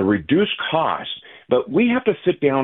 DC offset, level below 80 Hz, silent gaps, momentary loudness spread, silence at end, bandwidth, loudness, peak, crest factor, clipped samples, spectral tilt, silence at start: under 0.1%; -54 dBFS; none; 8 LU; 0 s; 4.1 kHz; -19 LUFS; -4 dBFS; 16 dB; under 0.1%; -10.5 dB/octave; 0 s